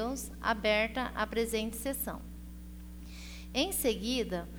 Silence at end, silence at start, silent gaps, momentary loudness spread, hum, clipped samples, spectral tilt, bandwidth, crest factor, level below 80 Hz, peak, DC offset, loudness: 0 s; 0 s; none; 19 LU; 60 Hz at -45 dBFS; under 0.1%; -3.5 dB/octave; over 20 kHz; 18 dB; -46 dBFS; -16 dBFS; under 0.1%; -33 LUFS